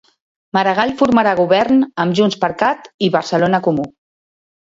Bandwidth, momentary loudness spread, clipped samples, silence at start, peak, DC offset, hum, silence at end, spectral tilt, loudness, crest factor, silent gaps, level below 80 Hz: 7.8 kHz; 6 LU; under 0.1%; 0.55 s; 0 dBFS; under 0.1%; none; 0.8 s; -6 dB/octave; -15 LUFS; 16 dB; 2.94-2.99 s; -54 dBFS